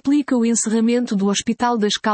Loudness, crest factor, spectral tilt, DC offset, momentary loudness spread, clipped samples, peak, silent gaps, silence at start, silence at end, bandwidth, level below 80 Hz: -18 LUFS; 12 dB; -4 dB/octave; under 0.1%; 2 LU; under 0.1%; -6 dBFS; none; 0.05 s; 0 s; 8.8 kHz; -58 dBFS